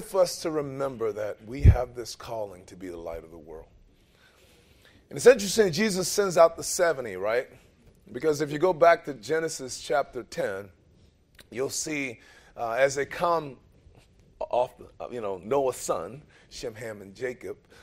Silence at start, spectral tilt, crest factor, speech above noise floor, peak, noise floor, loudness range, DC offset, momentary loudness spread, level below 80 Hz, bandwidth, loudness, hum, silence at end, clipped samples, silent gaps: 0 s; -4.5 dB/octave; 24 dB; 33 dB; -4 dBFS; -60 dBFS; 8 LU; under 0.1%; 20 LU; -40 dBFS; 16 kHz; -26 LUFS; none; 0.3 s; under 0.1%; none